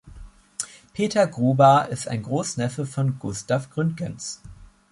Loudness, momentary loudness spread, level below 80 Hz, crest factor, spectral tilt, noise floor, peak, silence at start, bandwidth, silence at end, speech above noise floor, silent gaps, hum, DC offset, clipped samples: -23 LUFS; 17 LU; -52 dBFS; 20 dB; -5.5 dB/octave; -44 dBFS; -4 dBFS; 0.05 s; 11.5 kHz; 0.25 s; 22 dB; none; none; under 0.1%; under 0.1%